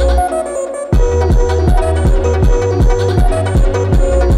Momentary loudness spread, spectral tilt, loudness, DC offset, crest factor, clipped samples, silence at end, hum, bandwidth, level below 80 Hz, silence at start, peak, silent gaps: 4 LU; -7 dB/octave; -14 LUFS; under 0.1%; 10 dB; under 0.1%; 0 s; none; 11.5 kHz; -14 dBFS; 0 s; 0 dBFS; none